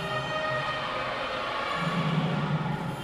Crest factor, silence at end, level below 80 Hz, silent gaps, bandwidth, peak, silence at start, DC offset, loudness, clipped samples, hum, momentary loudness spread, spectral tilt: 14 dB; 0 s; -54 dBFS; none; 13.5 kHz; -16 dBFS; 0 s; under 0.1%; -29 LUFS; under 0.1%; none; 3 LU; -6 dB/octave